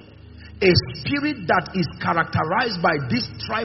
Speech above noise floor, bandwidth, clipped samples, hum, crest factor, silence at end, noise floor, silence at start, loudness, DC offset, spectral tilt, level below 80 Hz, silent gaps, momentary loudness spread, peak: 21 dB; 6 kHz; under 0.1%; none; 20 dB; 0 s; -42 dBFS; 0 s; -21 LUFS; under 0.1%; -4 dB/octave; -46 dBFS; none; 7 LU; -2 dBFS